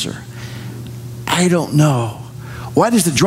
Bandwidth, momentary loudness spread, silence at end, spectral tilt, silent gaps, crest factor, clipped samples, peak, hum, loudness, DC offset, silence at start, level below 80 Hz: 16 kHz; 17 LU; 0 s; -5 dB/octave; none; 14 dB; under 0.1%; -2 dBFS; none; -16 LUFS; under 0.1%; 0 s; -46 dBFS